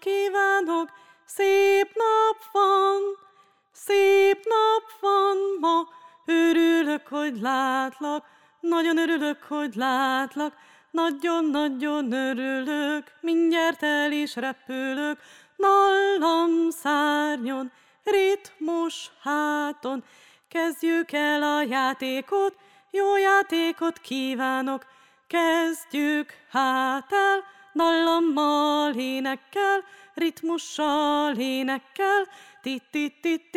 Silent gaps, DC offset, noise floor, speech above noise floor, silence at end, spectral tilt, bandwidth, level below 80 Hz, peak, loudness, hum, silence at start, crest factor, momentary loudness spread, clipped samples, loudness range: none; under 0.1%; -59 dBFS; 35 dB; 0 s; -3 dB/octave; 16.5 kHz; -82 dBFS; -10 dBFS; -24 LUFS; none; 0 s; 16 dB; 11 LU; under 0.1%; 4 LU